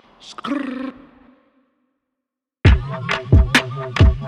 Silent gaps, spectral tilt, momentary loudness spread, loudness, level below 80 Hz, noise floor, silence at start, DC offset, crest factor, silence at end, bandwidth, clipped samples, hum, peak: none; -6 dB/octave; 17 LU; -18 LUFS; -22 dBFS; -83 dBFS; 0.25 s; under 0.1%; 18 dB; 0 s; 12.5 kHz; under 0.1%; none; 0 dBFS